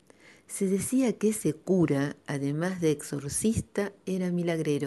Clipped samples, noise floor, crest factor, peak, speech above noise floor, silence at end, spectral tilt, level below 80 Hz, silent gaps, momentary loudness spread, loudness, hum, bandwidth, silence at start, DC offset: under 0.1%; -56 dBFS; 16 dB; -14 dBFS; 28 dB; 0 s; -6 dB/octave; -56 dBFS; none; 7 LU; -29 LUFS; none; 12 kHz; 0.5 s; under 0.1%